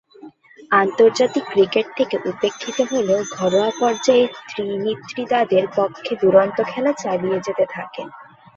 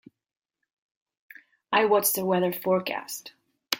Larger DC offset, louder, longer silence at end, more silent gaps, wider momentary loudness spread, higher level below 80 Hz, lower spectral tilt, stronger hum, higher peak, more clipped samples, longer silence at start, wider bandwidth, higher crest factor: neither; first, -19 LUFS vs -25 LUFS; first, 0.35 s vs 0 s; neither; second, 9 LU vs 13 LU; first, -64 dBFS vs -74 dBFS; about the same, -4.5 dB/octave vs -3.5 dB/octave; neither; about the same, -2 dBFS vs -2 dBFS; neither; second, 0.25 s vs 1.7 s; second, 7.8 kHz vs 17 kHz; second, 18 dB vs 26 dB